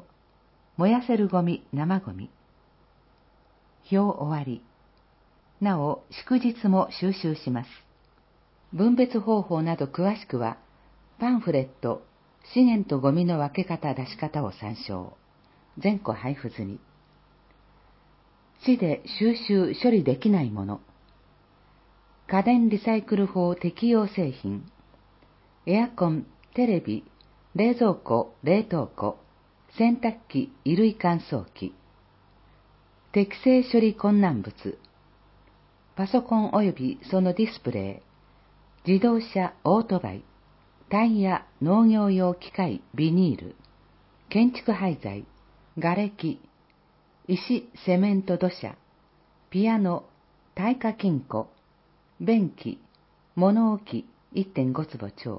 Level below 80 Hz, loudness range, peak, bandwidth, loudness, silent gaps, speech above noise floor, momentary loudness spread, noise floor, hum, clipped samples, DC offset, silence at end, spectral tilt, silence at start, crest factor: -60 dBFS; 5 LU; -8 dBFS; 5.8 kHz; -25 LUFS; none; 37 dB; 15 LU; -62 dBFS; none; under 0.1%; under 0.1%; 0 s; -11.5 dB/octave; 0.8 s; 18 dB